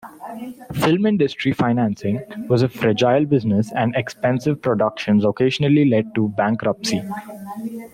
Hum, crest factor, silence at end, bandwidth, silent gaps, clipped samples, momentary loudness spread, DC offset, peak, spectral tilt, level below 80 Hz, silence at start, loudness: none; 14 dB; 0.05 s; 16 kHz; none; under 0.1%; 14 LU; under 0.1%; -4 dBFS; -6.5 dB/octave; -56 dBFS; 0.05 s; -19 LUFS